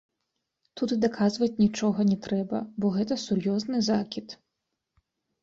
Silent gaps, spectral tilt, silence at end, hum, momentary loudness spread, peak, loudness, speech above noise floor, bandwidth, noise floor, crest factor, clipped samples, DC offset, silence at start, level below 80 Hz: none; -6 dB/octave; 1.1 s; none; 9 LU; -12 dBFS; -27 LUFS; 57 dB; 7.6 kHz; -83 dBFS; 16 dB; under 0.1%; under 0.1%; 0.75 s; -64 dBFS